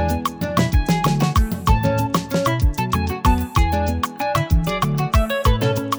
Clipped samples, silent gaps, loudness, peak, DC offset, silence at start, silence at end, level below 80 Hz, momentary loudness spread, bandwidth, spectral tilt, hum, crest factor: under 0.1%; none; -20 LUFS; -2 dBFS; under 0.1%; 0 s; 0 s; -24 dBFS; 4 LU; over 20 kHz; -6 dB/octave; none; 16 dB